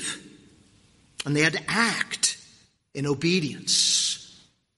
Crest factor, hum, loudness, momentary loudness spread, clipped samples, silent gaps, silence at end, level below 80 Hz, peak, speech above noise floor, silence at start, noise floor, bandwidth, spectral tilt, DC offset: 22 dB; none; -23 LUFS; 15 LU; under 0.1%; none; 0.5 s; -64 dBFS; -6 dBFS; 35 dB; 0 s; -59 dBFS; 11.5 kHz; -2.5 dB/octave; under 0.1%